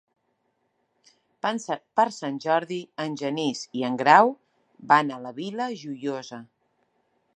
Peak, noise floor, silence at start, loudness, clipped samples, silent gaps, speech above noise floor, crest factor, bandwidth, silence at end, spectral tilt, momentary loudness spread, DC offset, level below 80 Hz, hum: -2 dBFS; -73 dBFS; 1.45 s; -25 LUFS; under 0.1%; none; 49 dB; 24 dB; 9.4 kHz; 0.95 s; -4.5 dB/octave; 16 LU; under 0.1%; -80 dBFS; none